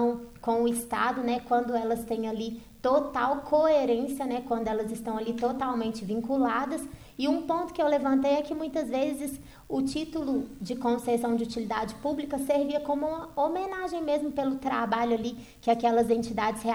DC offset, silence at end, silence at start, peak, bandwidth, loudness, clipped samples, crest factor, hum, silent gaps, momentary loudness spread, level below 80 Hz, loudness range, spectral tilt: under 0.1%; 0 s; 0 s; -12 dBFS; over 20 kHz; -29 LUFS; under 0.1%; 16 dB; none; none; 8 LU; -56 dBFS; 3 LU; -5 dB/octave